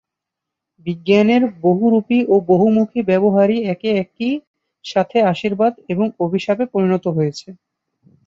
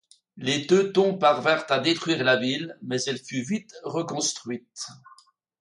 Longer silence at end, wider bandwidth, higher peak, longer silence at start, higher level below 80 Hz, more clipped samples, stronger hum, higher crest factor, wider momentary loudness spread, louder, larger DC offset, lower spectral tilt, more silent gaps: about the same, 0.75 s vs 0.65 s; second, 7.6 kHz vs 11.5 kHz; first, -2 dBFS vs -6 dBFS; first, 0.85 s vs 0.35 s; first, -60 dBFS vs -72 dBFS; neither; neither; about the same, 16 dB vs 20 dB; second, 9 LU vs 13 LU; first, -17 LUFS vs -24 LUFS; neither; first, -7.5 dB/octave vs -3.5 dB/octave; first, 4.47-4.54 s vs none